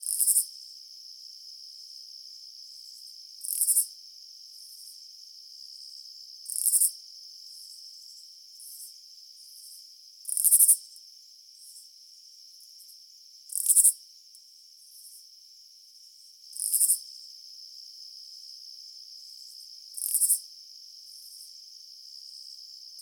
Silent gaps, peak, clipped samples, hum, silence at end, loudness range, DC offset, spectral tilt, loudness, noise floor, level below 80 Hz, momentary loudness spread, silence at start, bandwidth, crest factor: none; -2 dBFS; under 0.1%; none; 0 s; 6 LU; under 0.1%; 11.5 dB/octave; -23 LUFS; -54 dBFS; under -90 dBFS; 26 LU; 0 s; 18 kHz; 30 dB